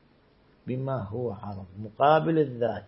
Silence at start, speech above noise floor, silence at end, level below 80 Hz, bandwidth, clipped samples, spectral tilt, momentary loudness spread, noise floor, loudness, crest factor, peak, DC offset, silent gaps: 0.65 s; 34 dB; 0 s; -62 dBFS; 5.8 kHz; under 0.1%; -11 dB/octave; 18 LU; -61 dBFS; -26 LUFS; 20 dB; -8 dBFS; under 0.1%; none